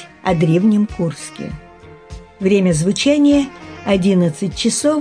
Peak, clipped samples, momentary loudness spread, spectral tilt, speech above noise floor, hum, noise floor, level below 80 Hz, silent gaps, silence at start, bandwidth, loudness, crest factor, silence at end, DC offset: -2 dBFS; under 0.1%; 15 LU; -5.5 dB/octave; 22 dB; none; -37 dBFS; -40 dBFS; none; 0 s; 10.5 kHz; -16 LUFS; 14 dB; 0 s; under 0.1%